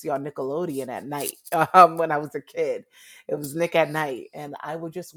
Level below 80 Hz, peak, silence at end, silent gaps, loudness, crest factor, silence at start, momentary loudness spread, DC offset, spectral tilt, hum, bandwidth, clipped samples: -72 dBFS; 0 dBFS; 0.05 s; none; -23 LUFS; 24 dB; 0 s; 18 LU; under 0.1%; -5 dB/octave; none; over 20 kHz; under 0.1%